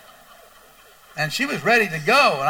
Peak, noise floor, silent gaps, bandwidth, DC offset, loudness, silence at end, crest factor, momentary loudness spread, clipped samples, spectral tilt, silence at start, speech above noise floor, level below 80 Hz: -2 dBFS; -50 dBFS; none; over 20 kHz; under 0.1%; -19 LUFS; 0 s; 18 dB; 11 LU; under 0.1%; -3.5 dB/octave; 1.15 s; 31 dB; -64 dBFS